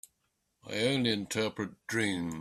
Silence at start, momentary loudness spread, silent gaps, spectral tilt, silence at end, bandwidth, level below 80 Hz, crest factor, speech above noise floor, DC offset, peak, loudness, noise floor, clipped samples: 0.65 s; 8 LU; none; -4 dB/octave; 0 s; 14 kHz; -68 dBFS; 20 dB; 47 dB; under 0.1%; -14 dBFS; -32 LUFS; -79 dBFS; under 0.1%